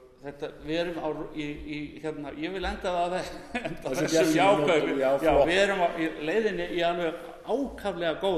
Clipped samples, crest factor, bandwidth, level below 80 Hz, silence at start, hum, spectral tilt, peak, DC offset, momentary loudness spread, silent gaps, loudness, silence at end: under 0.1%; 18 dB; 13.5 kHz; -48 dBFS; 0 s; none; -4.5 dB/octave; -10 dBFS; under 0.1%; 14 LU; none; -27 LUFS; 0 s